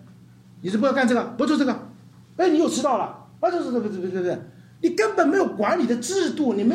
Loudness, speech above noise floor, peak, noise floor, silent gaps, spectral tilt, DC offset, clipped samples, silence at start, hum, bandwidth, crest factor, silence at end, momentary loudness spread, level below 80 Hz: -23 LUFS; 27 dB; -6 dBFS; -48 dBFS; none; -5 dB/octave; under 0.1%; under 0.1%; 0 s; none; 14 kHz; 16 dB; 0 s; 8 LU; -70 dBFS